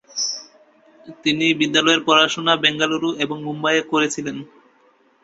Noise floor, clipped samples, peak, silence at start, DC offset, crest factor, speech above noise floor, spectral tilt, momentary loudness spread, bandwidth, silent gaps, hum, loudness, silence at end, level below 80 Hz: -57 dBFS; under 0.1%; -2 dBFS; 0.1 s; under 0.1%; 20 dB; 38 dB; -3 dB/octave; 10 LU; 8 kHz; none; none; -18 LUFS; 0.8 s; -64 dBFS